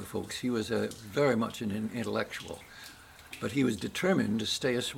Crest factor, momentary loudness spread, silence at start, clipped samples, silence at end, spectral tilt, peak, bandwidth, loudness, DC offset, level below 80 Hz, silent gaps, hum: 16 dB; 17 LU; 0 s; under 0.1%; 0 s; -5 dB/octave; -16 dBFS; 17 kHz; -31 LUFS; under 0.1%; -62 dBFS; none; none